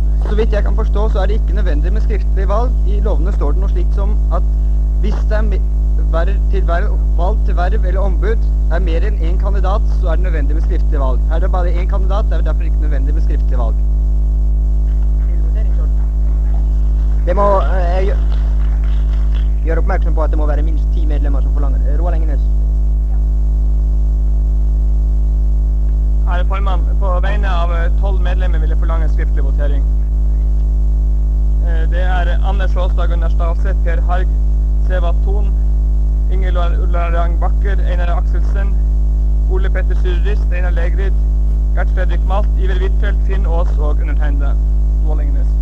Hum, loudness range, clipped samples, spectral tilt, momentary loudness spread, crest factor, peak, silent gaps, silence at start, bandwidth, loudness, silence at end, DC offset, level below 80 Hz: none; 1 LU; under 0.1%; -8.5 dB/octave; 1 LU; 12 dB; 0 dBFS; none; 0 s; 4 kHz; -16 LUFS; 0 s; 2%; -12 dBFS